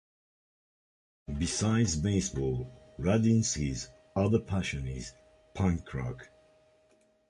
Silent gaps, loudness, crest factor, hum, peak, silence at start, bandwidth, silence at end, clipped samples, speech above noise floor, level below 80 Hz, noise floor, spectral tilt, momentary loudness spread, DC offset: none; -31 LUFS; 20 dB; none; -12 dBFS; 1.3 s; 11 kHz; 1.05 s; under 0.1%; 37 dB; -46 dBFS; -67 dBFS; -5.5 dB/octave; 15 LU; under 0.1%